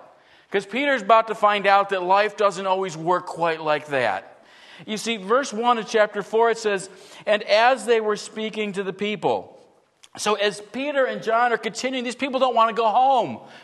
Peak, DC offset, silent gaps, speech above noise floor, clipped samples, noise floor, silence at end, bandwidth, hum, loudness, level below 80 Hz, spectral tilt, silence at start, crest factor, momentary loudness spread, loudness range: -4 dBFS; under 0.1%; none; 34 dB; under 0.1%; -55 dBFS; 0.05 s; 12.5 kHz; none; -22 LUFS; -78 dBFS; -3.5 dB/octave; 0.5 s; 18 dB; 10 LU; 4 LU